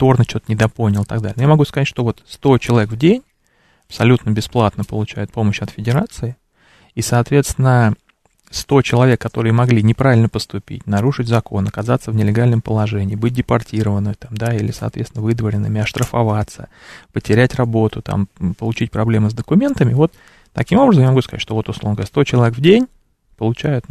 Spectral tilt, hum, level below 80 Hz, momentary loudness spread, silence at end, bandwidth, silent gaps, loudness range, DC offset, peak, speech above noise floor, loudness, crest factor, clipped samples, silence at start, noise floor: -7 dB/octave; none; -42 dBFS; 10 LU; 0.1 s; 13.5 kHz; none; 4 LU; under 0.1%; 0 dBFS; 42 dB; -16 LUFS; 16 dB; under 0.1%; 0 s; -57 dBFS